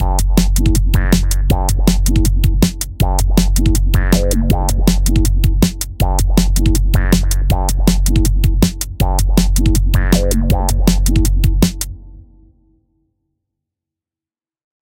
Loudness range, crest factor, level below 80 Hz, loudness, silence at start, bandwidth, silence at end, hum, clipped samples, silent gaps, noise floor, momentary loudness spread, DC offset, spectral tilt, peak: 4 LU; 14 dB; -14 dBFS; -15 LUFS; 0 s; 17 kHz; 2.8 s; none; under 0.1%; none; under -90 dBFS; 3 LU; under 0.1%; -5.5 dB/octave; 0 dBFS